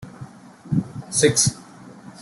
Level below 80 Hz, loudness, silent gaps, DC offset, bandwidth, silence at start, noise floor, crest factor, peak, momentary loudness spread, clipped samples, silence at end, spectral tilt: -54 dBFS; -20 LUFS; none; under 0.1%; 12.5 kHz; 0 s; -42 dBFS; 20 dB; -4 dBFS; 25 LU; under 0.1%; 0 s; -3.5 dB/octave